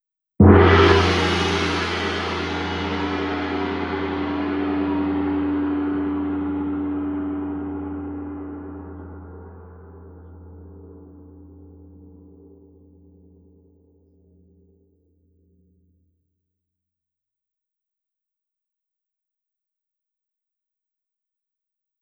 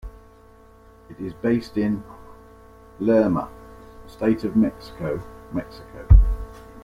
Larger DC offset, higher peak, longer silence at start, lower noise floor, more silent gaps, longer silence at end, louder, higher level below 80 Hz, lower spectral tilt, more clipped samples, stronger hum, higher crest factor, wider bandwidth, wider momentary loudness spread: neither; about the same, 0 dBFS vs -2 dBFS; first, 0.4 s vs 0.05 s; first, -86 dBFS vs -50 dBFS; neither; first, 9.95 s vs 0.05 s; about the same, -21 LUFS vs -23 LUFS; second, -42 dBFS vs -26 dBFS; second, -6.5 dB/octave vs -9.5 dB/octave; neither; neither; about the same, 24 dB vs 20 dB; first, 10 kHz vs 5.4 kHz; first, 28 LU vs 22 LU